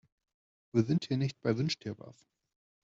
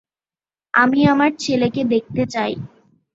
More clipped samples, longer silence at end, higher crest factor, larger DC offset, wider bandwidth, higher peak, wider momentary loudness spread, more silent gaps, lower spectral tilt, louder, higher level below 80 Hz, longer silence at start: neither; first, 0.75 s vs 0.45 s; about the same, 20 dB vs 18 dB; neither; about the same, 8 kHz vs 8 kHz; second, -14 dBFS vs 0 dBFS; about the same, 11 LU vs 10 LU; neither; about the same, -6.5 dB/octave vs -5.5 dB/octave; second, -32 LUFS vs -18 LUFS; second, -70 dBFS vs -54 dBFS; about the same, 0.75 s vs 0.75 s